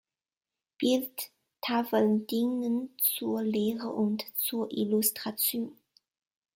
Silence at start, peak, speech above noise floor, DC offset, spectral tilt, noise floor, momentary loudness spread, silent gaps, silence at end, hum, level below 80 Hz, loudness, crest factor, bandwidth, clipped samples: 0.8 s; -12 dBFS; over 61 dB; under 0.1%; -4 dB/octave; under -90 dBFS; 9 LU; none; 0.85 s; none; -76 dBFS; -29 LUFS; 18 dB; 17 kHz; under 0.1%